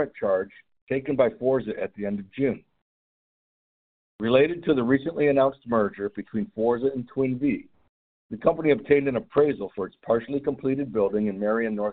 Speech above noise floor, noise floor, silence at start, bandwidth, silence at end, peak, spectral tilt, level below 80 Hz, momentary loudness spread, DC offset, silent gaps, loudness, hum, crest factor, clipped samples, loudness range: over 66 dB; under -90 dBFS; 0 s; 4.4 kHz; 0 s; -6 dBFS; -6 dB/octave; -58 dBFS; 10 LU; under 0.1%; 0.82-0.87 s, 2.82-4.19 s, 7.89-8.29 s; -25 LUFS; none; 20 dB; under 0.1%; 4 LU